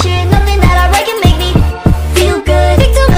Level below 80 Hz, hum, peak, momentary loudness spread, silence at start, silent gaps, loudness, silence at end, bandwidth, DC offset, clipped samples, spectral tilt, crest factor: -12 dBFS; none; 0 dBFS; 3 LU; 0 s; none; -10 LUFS; 0 s; 16.5 kHz; under 0.1%; 2%; -5.5 dB/octave; 8 dB